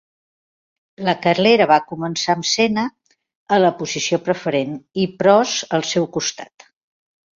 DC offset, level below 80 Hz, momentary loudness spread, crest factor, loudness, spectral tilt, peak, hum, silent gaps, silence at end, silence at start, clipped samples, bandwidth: under 0.1%; -62 dBFS; 10 LU; 18 dB; -18 LUFS; -4 dB/octave; -2 dBFS; none; 3.35-3.46 s; 0.9 s; 1 s; under 0.1%; 7.6 kHz